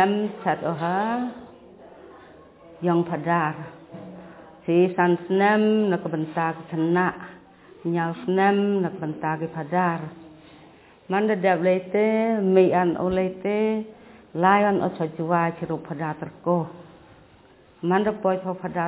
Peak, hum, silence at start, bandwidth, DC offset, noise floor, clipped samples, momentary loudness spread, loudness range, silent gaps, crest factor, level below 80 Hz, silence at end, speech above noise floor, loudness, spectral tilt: -4 dBFS; none; 0 s; 4 kHz; under 0.1%; -53 dBFS; under 0.1%; 14 LU; 6 LU; none; 20 dB; -60 dBFS; 0 s; 31 dB; -23 LUFS; -11 dB/octave